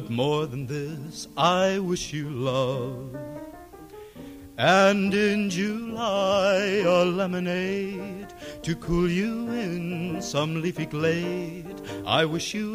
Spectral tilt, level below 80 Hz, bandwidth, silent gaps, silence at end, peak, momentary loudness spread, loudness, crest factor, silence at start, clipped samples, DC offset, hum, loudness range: -5 dB/octave; -50 dBFS; 15.5 kHz; none; 0 s; -6 dBFS; 17 LU; -25 LUFS; 20 dB; 0 s; under 0.1%; under 0.1%; none; 6 LU